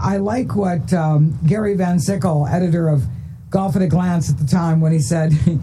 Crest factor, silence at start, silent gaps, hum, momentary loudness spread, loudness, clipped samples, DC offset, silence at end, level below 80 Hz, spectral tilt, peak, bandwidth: 14 dB; 0 s; none; none; 4 LU; -17 LUFS; under 0.1%; under 0.1%; 0 s; -40 dBFS; -7.5 dB/octave; -2 dBFS; 12.5 kHz